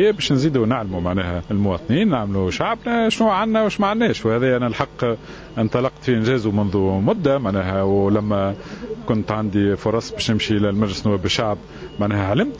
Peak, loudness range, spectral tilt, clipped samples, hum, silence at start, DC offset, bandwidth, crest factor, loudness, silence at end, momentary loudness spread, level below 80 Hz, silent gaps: 0 dBFS; 2 LU; -6.5 dB/octave; under 0.1%; none; 0 s; under 0.1%; 8 kHz; 20 dB; -20 LUFS; 0 s; 6 LU; -40 dBFS; none